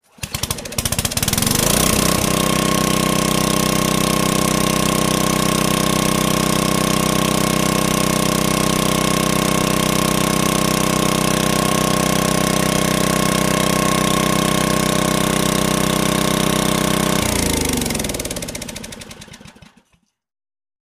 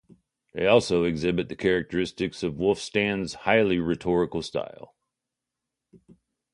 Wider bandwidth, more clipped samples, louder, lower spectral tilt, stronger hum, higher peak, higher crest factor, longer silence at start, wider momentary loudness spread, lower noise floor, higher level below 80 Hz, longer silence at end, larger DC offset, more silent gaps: first, 15.5 kHz vs 11.5 kHz; neither; first, -17 LUFS vs -25 LUFS; second, -3.5 dB/octave vs -5.5 dB/octave; second, none vs 60 Hz at -60 dBFS; about the same, -2 dBFS vs -4 dBFS; second, 14 dB vs 22 dB; second, 0.2 s vs 0.55 s; second, 4 LU vs 9 LU; second, -62 dBFS vs -86 dBFS; first, -34 dBFS vs -52 dBFS; second, 1.3 s vs 1.7 s; neither; neither